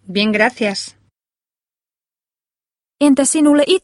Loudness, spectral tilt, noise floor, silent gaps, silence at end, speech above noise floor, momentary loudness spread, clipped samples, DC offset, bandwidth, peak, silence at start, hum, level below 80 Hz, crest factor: -14 LUFS; -3 dB/octave; under -90 dBFS; none; 0.05 s; over 76 dB; 10 LU; under 0.1%; under 0.1%; 12 kHz; 0 dBFS; 0.1 s; none; -60 dBFS; 18 dB